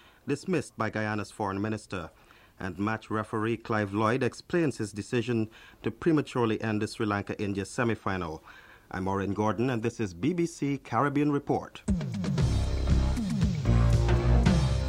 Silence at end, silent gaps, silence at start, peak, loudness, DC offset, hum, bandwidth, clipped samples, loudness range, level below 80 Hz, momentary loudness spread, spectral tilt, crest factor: 0 s; none; 0.25 s; -10 dBFS; -29 LUFS; under 0.1%; none; 12 kHz; under 0.1%; 4 LU; -36 dBFS; 10 LU; -7 dB/octave; 18 dB